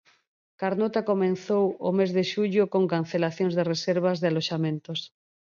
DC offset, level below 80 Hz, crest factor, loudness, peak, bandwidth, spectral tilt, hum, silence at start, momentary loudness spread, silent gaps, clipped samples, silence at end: under 0.1%; -74 dBFS; 16 dB; -26 LUFS; -10 dBFS; 7.4 kHz; -6.5 dB/octave; none; 0.6 s; 6 LU; none; under 0.1%; 0.5 s